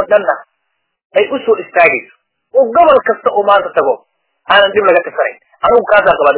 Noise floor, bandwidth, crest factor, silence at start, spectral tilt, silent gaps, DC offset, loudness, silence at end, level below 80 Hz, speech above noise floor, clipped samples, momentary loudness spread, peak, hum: -69 dBFS; 4 kHz; 12 dB; 0 s; -7 dB/octave; 1.05-1.10 s; under 0.1%; -11 LUFS; 0 s; -48 dBFS; 58 dB; 0.5%; 9 LU; 0 dBFS; none